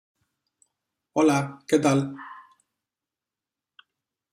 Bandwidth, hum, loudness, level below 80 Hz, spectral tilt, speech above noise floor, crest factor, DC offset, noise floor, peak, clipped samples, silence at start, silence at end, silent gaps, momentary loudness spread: 15 kHz; none; -24 LUFS; -72 dBFS; -6 dB/octave; 67 dB; 20 dB; under 0.1%; -89 dBFS; -8 dBFS; under 0.1%; 1.15 s; 1.95 s; none; 17 LU